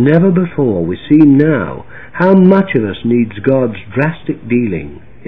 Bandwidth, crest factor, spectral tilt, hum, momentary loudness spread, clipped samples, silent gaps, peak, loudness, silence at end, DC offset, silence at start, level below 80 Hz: 4.8 kHz; 12 dB; -11.5 dB/octave; none; 15 LU; 0.6%; none; 0 dBFS; -12 LUFS; 0.3 s; 2%; 0 s; -42 dBFS